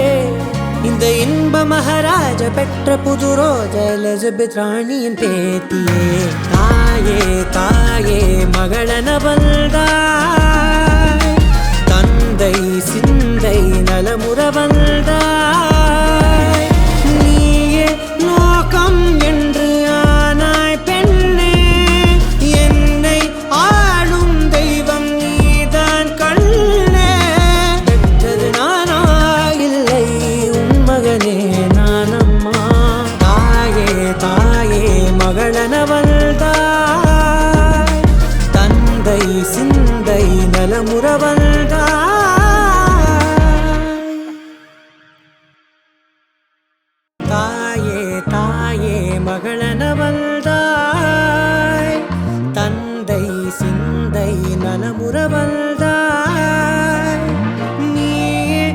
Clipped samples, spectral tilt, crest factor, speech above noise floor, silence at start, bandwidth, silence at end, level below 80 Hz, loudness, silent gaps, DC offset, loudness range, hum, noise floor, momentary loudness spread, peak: under 0.1%; -5.5 dB/octave; 12 dB; 57 dB; 0 s; 17 kHz; 0 s; -16 dBFS; -13 LUFS; none; under 0.1%; 5 LU; none; -69 dBFS; 6 LU; 0 dBFS